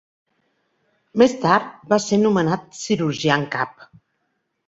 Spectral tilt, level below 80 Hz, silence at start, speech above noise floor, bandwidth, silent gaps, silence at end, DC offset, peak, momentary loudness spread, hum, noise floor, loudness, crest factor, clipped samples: -5 dB/octave; -60 dBFS; 1.15 s; 53 dB; 8 kHz; none; 0.95 s; under 0.1%; -2 dBFS; 9 LU; none; -73 dBFS; -20 LUFS; 20 dB; under 0.1%